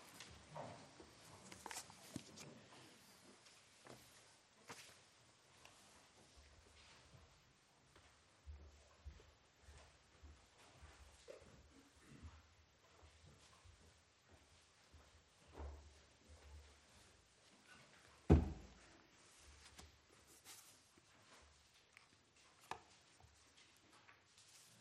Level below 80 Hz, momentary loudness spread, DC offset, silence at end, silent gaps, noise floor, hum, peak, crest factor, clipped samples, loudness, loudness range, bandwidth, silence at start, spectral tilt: -60 dBFS; 13 LU; under 0.1%; 0 s; none; -73 dBFS; none; -18 dBFS; 34 dB; under 0.1%; -49 LUFS; 21 LU; 14 kHz; 0 s; -6 dB/octave